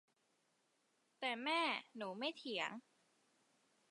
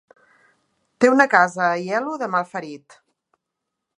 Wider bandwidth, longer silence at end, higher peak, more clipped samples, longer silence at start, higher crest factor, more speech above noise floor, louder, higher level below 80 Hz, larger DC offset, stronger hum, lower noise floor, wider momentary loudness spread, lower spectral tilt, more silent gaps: about the same, 11 kHz vs 11 kHz; about the same, 1.1 s vs 1.2 s; second, -24 dBFS vs 0 dBFS; neither; first, 1.2 s vs 1 s; about the same, 22 dB vs 22 dB; second, 38 dB vs 62 dB; second, -42 LUFS vs -19 LUFS; second, under -90 dBFS vs -72 dBFS; neither; neither; about the same, -81 dBFS vs -81 dBFS; second, 9 LU vs 17 LU; second, -3 dB/octave vs -5 dB/octave; neither